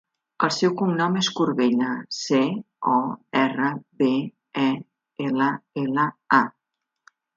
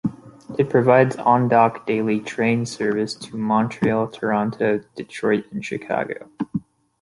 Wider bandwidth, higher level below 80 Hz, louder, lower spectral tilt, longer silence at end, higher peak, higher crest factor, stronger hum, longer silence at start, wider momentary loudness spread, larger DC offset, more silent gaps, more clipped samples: second, 7.8 kHz vs 11.5 kHz; second, -72 dBFS vs -58 dBFS; about the same, -23 LUFS vs -21 LUFS; second, -5 dB/octave vs -6.5 dB/octave; first, 0.85 s vs 0.4 s; about the same, -2 dBFS vs -2 dBFS; about the same, 22 dB vs 18 dB; neither; first, 0.4 s vs 0.05 s; second, 8 LU vs 13 LU; neither; neither; neither